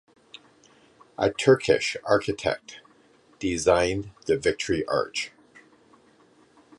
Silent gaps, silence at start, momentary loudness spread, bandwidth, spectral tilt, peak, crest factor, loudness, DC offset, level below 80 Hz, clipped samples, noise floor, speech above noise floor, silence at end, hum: none; 1.2 s; 12 LU; 11.5 kHz; -4.5 dB/octave; -6 dBFS; 22 dB; -25 LUFS; under 0.1%; -52 dBFS; under 0.1%; -59 dBFS; 34 dB; 1.5 s; none